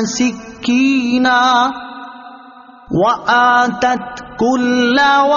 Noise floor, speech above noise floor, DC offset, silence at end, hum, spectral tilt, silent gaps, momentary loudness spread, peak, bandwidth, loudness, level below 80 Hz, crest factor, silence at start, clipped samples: -39 dBFS; 26 dB; under 0.1%; 0 s; none; -2 dB/octave; none; 15 LU; -2 dBFS; 7.4 kHz; -14 LUFS; -50 dBFS; 12 dB; 0 s; under 0.1%